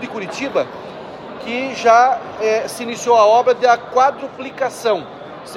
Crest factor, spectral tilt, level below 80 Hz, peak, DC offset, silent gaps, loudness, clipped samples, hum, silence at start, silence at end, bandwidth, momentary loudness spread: 16 dB; -3.5 dB/octave; -60 dBFS; -2 dBFS; under 0.1%; none; -16 LUFS; under 0.1%; none; 0 s; 0 s; 14 kHz; 20 LU